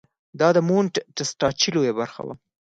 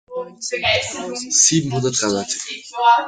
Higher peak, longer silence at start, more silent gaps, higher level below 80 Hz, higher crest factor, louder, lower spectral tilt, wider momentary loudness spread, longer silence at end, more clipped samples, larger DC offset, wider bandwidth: second, -6 dBFS vs -2 dBFS; first, 0.35 s vs 0.1 s; neither; about the same, -60 dBFS vs -56 dBFS; about the same, 18 dB vs 18 dB; second, -22 LUFS vs -18 LUFS; first, -4.5 dB/octave vs -2.5 dB/octave; about the same, 12 LU vs 14 LU; first, 0.45 s vs 0 s; neither; neither; second, 9.2 kHz vs 10.5 kHz